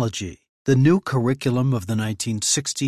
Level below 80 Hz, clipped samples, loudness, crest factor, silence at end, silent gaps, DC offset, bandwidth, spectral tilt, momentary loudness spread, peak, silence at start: -50 dBFS; under 0.1%; -21 LUFS; 14 dB; 0 s; 0.49-0.65 s; under 0.1%; 14 kHz; -5 dB/octave; 11 LU; -6 dBFS; 0 s